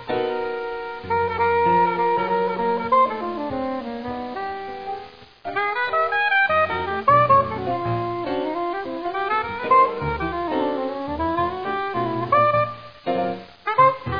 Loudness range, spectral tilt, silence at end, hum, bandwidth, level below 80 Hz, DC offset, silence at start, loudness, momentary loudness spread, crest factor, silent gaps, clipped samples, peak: 4 LU; -8 dB/octave; 0 s; none; 5.2 kHz; -48 dBFS; 0.3%; 0 s; -22 LUFS; 12 LU; 16 dB; none; under 0.1%; -6 dBFS